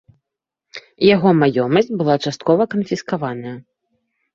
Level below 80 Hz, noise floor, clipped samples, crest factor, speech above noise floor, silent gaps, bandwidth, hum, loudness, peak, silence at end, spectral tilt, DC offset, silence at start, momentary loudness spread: -58 dBFS; -83 dBFS; under 0.1%; 18 dB; 66 dB; none; 7.6 kHz; none; -17 LUFS; 0 dBFS; 0.75 s; -6.5 dB/octave; under 0.1%; 0.75 s; 23 LU